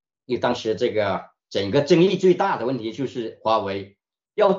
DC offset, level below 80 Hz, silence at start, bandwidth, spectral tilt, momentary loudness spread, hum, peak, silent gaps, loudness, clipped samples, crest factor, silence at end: under 0.1%; -66 dBFS; 0.3 s; 7.6 kHz; -6.5 dB/octave; 12 LU; none; -4 dBFS; none; -22 LUFS; under 0.1%; 18 dB; 0 s